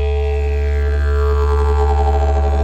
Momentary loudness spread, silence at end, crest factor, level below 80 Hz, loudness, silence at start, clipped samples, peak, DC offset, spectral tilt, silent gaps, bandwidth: 3 LU; 0 s; 10 dB; -16 dBFS; -17 LUFS; 0 s; under 0.1%; -4 dBFS; under 0.1%; -7.5 dB/octave; none; 7.8 kHz